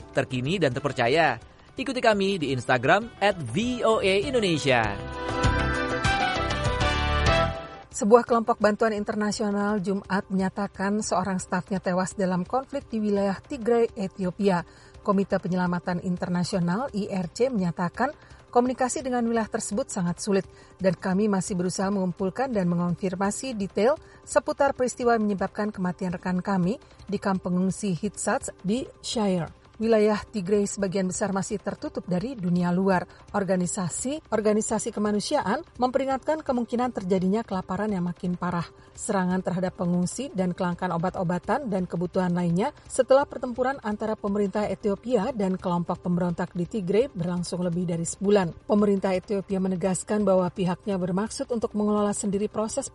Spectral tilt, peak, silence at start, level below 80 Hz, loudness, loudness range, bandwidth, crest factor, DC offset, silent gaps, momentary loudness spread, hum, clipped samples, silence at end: -5.5 dB/octave; -2 dBFS; 0 s; -44 dBFS; -26 LUFS; 4 LU; 11.5 kHz; 24 dB; under 0.1%; none; 7 LU; none; under 0.1%; 0.05 s